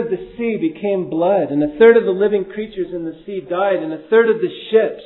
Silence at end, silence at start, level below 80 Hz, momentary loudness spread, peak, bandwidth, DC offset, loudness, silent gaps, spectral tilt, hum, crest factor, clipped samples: 0 s; 0 s; -54 dBFS; 14 LU; 0 dBFS; 4.1 kHz; under 0.1%; -17 LUFS; none; -10 dB/octave; none; 16 dB; under 0.1%